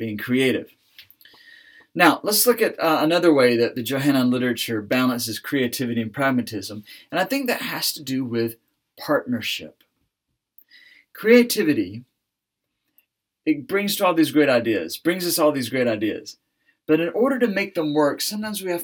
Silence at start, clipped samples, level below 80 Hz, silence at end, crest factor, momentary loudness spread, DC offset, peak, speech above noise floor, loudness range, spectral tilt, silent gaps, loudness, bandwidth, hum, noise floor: 0 s; under 0.1%; -74 dBFS; 0 s; 20 dB; 11 LU; under 0.1%; -2 dBFS; 60 dB; 6 LU; -4 dB/octave; none; -21 LUFS; over 20 kHz; none; -81 dBFS